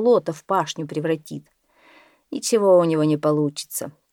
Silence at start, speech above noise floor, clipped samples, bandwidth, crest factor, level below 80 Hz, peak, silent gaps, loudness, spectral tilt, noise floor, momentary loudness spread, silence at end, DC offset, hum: 0 s; 33 dB; under 0.1%; 19 kHz; 16 dB; -72 dBFS; -6 dBFS; none; -21 LUFS; -5.5 dB/octave; -54 dBFS; 14 LU; 0.2 s; under 0.1%; none